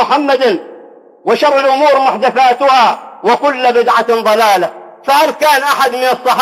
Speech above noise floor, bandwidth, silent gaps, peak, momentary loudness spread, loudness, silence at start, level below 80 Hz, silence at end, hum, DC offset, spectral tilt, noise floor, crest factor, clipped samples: 27 dB; 16 kHz; none; 0 dBFS; 6 LU; -11 LUFS; 0 s; -64 dBFS; 0 s; none; under 0.1%; -2.5 dB/octave; -37 dBFS; 10 dB; under 0.1%